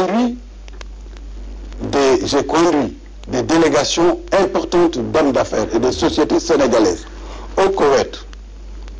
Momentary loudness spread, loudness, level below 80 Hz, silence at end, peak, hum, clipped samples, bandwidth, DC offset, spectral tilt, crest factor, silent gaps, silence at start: 21 LU; -16 LUFS; -34 dBFS; 0 s; -4 dBFS; none; under 0.1%; 9.8 kHz; under 0.1%; -4.5 dB/octave; 12 dB; none; 0 s